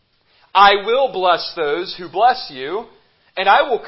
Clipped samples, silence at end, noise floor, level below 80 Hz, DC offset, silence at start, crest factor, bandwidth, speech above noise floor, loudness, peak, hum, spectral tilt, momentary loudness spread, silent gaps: under 0.1%; 0 s; -57 dBFS; -56 dBFS; under 0.1%; 0.55 s; 18 dB; 5.8 kHz; 41 dB; -16 LUFS; 0 dBFS; none; -6.5 dB/octave; 14 LU; none